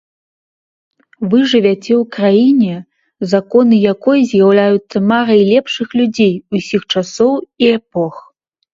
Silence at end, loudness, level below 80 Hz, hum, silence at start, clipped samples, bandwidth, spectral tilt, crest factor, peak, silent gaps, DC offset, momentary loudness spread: 0.55 s; -13 LUFS; -58 dBFS; none; 1.2 s; under 0.1%; 7.6 kHz; -6.5 dB/octave; 12 dB; 0 dBFS; none; under 0.1%; 8 LU